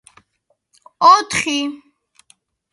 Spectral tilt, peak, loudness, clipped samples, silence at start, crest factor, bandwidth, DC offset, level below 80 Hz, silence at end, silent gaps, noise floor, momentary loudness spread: -2 dB/octave; 0 dBFS; -15 LUFS; under 0.1%; 1 s; 20 dB; 11.5 kHz; under 0.1%; -58 dBFS; 0.95 s; none; -68 dBFS; 11 LU